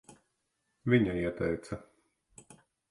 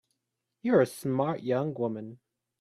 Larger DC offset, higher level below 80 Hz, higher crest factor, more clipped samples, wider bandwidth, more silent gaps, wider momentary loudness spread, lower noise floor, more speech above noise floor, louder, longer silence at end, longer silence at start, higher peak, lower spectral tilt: neither; first, -56 dBFS vs -74 dBFS; about the same, 22 dB vs 20 dB; neither; second, 11.5 kHz vs 14.5 kHz; neither; first, 16 LU vs 12 LU; second, -80 dBFS vs -84 dBFS; second, 50 dB vs 56 dB; about the same, -31 LUFS vs -29 LUFS; first, 1.1 s vs 0.45 s; first, 0.85 s vs 0.65 s; about the same, -12 dBFS vs -10 dBFS; about the same, -7.5 dB/octave vs -7 dB/octave